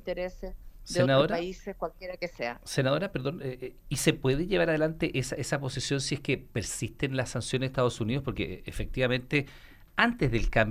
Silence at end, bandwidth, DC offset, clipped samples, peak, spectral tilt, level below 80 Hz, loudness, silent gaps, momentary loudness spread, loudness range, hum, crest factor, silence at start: 0 s; 15.5 kHz; under 0.1%; under 0.1%; -8 dBFS; -5 dB/octave; -44 dBFS; -30 LUFS; none; 12 LU; 2 LU; none; 22 dB; 0.05 s